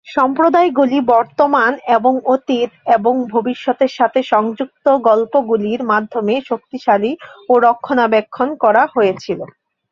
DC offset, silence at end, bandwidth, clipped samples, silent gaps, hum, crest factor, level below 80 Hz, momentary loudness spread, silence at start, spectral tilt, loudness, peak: under 0.1%; 0.45 s; 7.2 kHz; under 0.1%; none; none; 14 dB; -62 dBFS; 7 LU; 0.05 s; -6 dB/octave; -15 LUFS; 0 dBFS